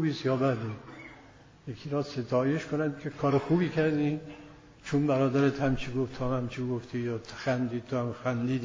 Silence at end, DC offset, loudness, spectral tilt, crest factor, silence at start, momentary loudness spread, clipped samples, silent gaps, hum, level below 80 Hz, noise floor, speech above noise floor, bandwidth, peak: 0 s; under 0.1%; -30 LUFS; -7.5 dB/octave; 16 dB; 0 s; 17 LU; under 0.1%; none; none; -56 dBFS; -54 dBFS; 25 dB; 7.6 kHz; -14 dBFS